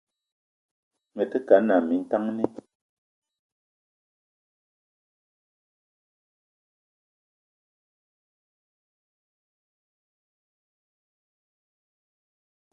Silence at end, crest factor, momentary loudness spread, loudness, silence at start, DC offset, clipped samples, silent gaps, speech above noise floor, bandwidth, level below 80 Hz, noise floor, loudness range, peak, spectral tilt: 10.25 s; 28 dB; 12 LU; -24 LUFS; 1.15 s; under 0.1%; under 0.1%; none; over 67 dB; 6.4 kHz; -78 dBFS; under -90 dBFS; 10 LU; -4 dBFS; -8 dB/octave